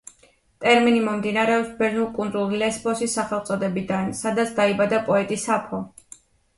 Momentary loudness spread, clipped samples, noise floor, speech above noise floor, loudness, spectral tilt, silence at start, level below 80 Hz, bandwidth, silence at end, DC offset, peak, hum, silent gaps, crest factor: 7 LU; under 0.1%; -58 dBFS; 36 dB; -22 LUFS; -4.5 dB/octave; 0.6 s; -58 dBFS; 11.5 kHz; 0.7 s; under 0.1%; -4 dBFS; none; none; 18 dB